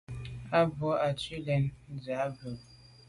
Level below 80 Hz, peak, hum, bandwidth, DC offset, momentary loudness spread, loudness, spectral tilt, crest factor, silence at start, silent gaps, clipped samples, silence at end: -56 dBFS; -14 dBFS; none; 11.5 kHz; under 0.1%; 15 LU; -32 LUFS; -7 dB/octave; 18 dB; 0.1 s; none; under 0.1%; 0.05 s